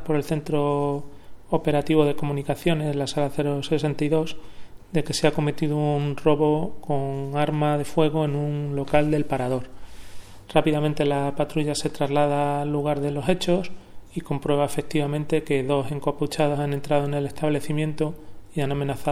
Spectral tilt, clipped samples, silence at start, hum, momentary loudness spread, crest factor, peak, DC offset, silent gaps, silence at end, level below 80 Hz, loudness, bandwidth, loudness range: -6.5 dB/octave; under 0.1%; 0 s; none; 7 LU; 20 dB; -2 dBFS; under 0.1%; none; 0 s; -46 dBFS; -24 LUFS; 15 kHz; 2 LU